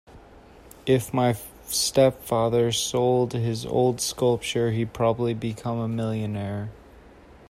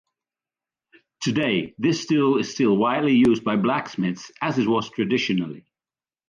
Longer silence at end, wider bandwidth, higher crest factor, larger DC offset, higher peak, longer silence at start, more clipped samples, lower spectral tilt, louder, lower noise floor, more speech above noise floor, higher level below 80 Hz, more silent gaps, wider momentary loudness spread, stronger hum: second, 0.5 s vs 0.7 s; first, 16 kHz vs 9.4 kHz; first, 20 dB vs 14 dB; neither; about the same, -6 dBFS vs -8 dBFS; second, 0.1 s vs 1.2 s; neither; about the same, -5 dB/octave vs -5.5 dB/octave; about the same, -24 LUFS vs -22 LUFS; second, -49 dBFS vs under -90 dBFS; second, 26 dB vs over 69 dB; first, -52 dBFS vs -62 dBFS; neither; about the same, 8 LU vs 9 LU; neither